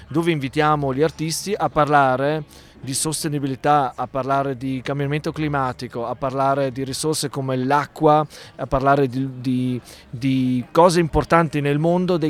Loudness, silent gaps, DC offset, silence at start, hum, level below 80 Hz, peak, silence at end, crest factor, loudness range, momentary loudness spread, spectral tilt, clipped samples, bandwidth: -20 LUFS; none; under 0.1%; 0 s; none; -44 dBFS; -2 dBFS; 0 s; 18 dB; 3 LU; 10 LU; -5.5 dB/octave; under 0.1%; 16 kHz